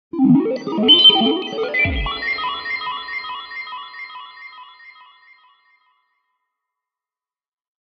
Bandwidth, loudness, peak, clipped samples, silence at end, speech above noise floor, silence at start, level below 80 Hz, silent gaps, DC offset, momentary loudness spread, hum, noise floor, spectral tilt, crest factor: 6.4 kHz; -15 LUFS; 0 dBFS; under 0.1%; 3.05 s; over 74 dB; 0.15 s; -40 dBFS; none; under 0.1%; 25 LU; none; under -90 dBFS; -6 dB/octave; 20 dB